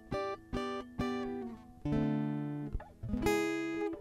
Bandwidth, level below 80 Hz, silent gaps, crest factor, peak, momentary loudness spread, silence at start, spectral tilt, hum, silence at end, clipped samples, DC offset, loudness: 15.5 kHz; -50 dBFS; none; 18 dB; -18 dBFS; 11 LU; 0 s; -6.5 dB/octave; none; 0 s; under 0.1%; under 0.1%; -37 LUFS